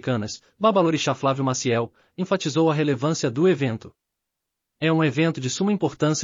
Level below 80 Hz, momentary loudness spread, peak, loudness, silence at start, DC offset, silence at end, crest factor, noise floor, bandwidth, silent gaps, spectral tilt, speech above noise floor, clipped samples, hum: -64 dBFS; 7 LU; -6 dBFS; -22 LUFS; 0.05 s; under 0.1%; 0 s; 16 dB; -82 dBFS; 7.6 kHz; none; -5.5 dB/octave; 60 dB; under 0.1%; none